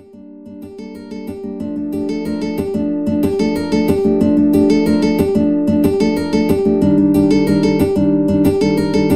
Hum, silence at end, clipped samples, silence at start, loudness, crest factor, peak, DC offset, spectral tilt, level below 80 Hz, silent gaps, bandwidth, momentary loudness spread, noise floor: none; 0 s; under 0.1%; 0 s; -15 LUFS; 14 dB; 0 dBFS; 1%; -7.5 dB/octave; -40 dBFS; none; 15 kHz; 15 LU; -36 dBFS